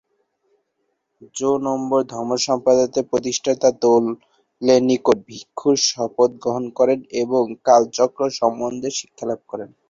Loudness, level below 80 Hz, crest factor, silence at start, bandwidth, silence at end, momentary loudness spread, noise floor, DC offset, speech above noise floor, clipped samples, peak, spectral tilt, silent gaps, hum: -19 LUFS; -62 dBFS; 18 dB; 1.2 s; 7.8 kHz; 0.25 s; 11 LU; -72 dBFS; under 0.1%; 53 dB; under 0.1%; -2 dBFS; -4 dB/octave; none; none